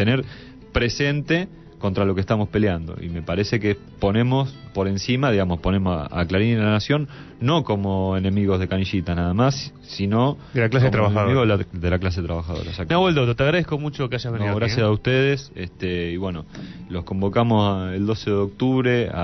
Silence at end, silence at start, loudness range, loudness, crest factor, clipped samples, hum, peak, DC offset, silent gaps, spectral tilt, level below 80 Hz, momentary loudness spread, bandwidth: 0 s; 0 s; 3 LU; -22 LUFS; 14 dB; under 0.1%; none; -6 dBFS; under 0.1%; none; -7 dB/octave; -42 dBFS; 10 LU; 6.2 kHz